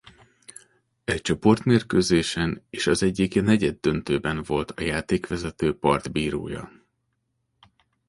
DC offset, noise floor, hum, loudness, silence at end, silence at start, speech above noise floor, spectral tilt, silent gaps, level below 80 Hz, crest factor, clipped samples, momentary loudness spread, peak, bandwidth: under 0.1%; -75 dBFS; none; -24 LUFS; 1.4 s; 1.1 s; 51 dB; -5.5 dB/octave; none; -46 dBFS; 20 dB; under 0.1%; 8 LU; -6 dBFS; 11.5 kHz